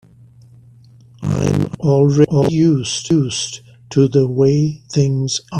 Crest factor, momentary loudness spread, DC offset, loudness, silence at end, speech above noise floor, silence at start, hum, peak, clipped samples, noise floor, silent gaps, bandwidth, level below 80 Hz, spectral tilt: 16 dB; 8 LU; under 0.1%; -16 LUFS; 0 s; 30 dB; 1.2 s; none; 0 dBFS; under 0.1%; -45 dBFS; none; 10 kHz; -50 dBFS; -6.5 dB/octave